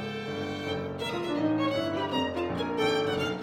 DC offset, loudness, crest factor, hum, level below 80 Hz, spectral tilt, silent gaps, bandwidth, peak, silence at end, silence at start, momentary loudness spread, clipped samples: under 0.1%; -30 LUFS; 14 dB; none; -60 dBFS; -5.5 dB/octave; none; 16.5 kHz; -16 dBFS; 0 s; 0 s; 6 LU; under 0.1%